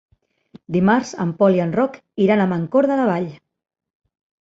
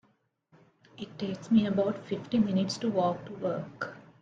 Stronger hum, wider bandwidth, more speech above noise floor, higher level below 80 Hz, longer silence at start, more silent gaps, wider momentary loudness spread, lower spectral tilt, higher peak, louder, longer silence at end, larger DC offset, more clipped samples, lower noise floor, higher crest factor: neither; second, 7.8 kHz vs 9 kHz; second, 31 dB vs 41 dB; first, -58 dBFS vs -68 dBFS; second, 0.7 s vs 1 s; neither; second, 8 LU vs 13 LU; about the same, -7.5 dB/octave vs -6.5 dB/octave; first, -2 dBFS vs -12 dBFS; first, -19 LUFS vs -30 LUFS; first, 1.05 s vs 0.2 s; neither; neither; second, -49 dBFS vs -71 dBFS; about the same, 18 dB vs 18 dB